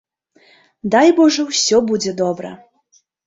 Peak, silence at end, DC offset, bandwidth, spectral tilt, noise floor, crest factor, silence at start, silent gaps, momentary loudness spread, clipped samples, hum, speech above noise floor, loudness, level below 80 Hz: -2 dBFS; 0.7 s; under 0.1%; 8 kHz; -3.5 dB/octave; -58 dBFS; 16 dB; 0.85 s; none; 16 LU; under 0.1%; none; 44 dB; -15 LUFS; -60 dBFS